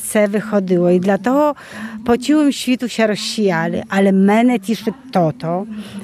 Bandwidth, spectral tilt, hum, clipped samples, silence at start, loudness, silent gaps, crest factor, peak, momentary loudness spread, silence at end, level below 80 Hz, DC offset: 15 kHz; -5.5 dB/octave; none; under 0.1%; 0 s; -16 LUFS; none; 14 dB; -2 dBFS; 9 LU; 0 s; -54 dBFS; under 0.1%